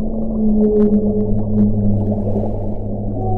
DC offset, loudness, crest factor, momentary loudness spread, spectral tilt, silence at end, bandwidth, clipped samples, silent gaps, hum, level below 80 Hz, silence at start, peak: under 0.1%; -17 LUFS; 12 dB; 10 LU; -13.5 dB/octave; 0 s; 1.8 kHz; under 0.1%; none; none; -24 dBFS; 0 s; -4 dBFS